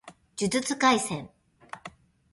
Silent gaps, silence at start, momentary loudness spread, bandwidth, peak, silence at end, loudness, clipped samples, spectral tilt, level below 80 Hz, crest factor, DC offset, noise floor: none; 0.05 s; 21 LU; 11.5 kHz; -8 dBFS; 0.45 s; -26 LUFS; under 0.1%; -3.5 dB/octave; -64 dBFS; 20 dB; under 0.1%; -49 dBFS